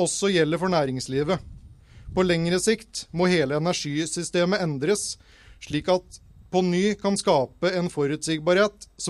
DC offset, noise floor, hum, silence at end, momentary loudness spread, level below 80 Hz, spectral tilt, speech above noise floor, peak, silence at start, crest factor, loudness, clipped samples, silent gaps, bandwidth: under 0.1%; -47 dBFS; none; 0 s; 7 LU; -50 dBFS; -4.5 dB/octave; 24 dB; -8 dBFS; 0 s; 18 dB; -24 LUFS; under 0.1%; none; 13.5 kHz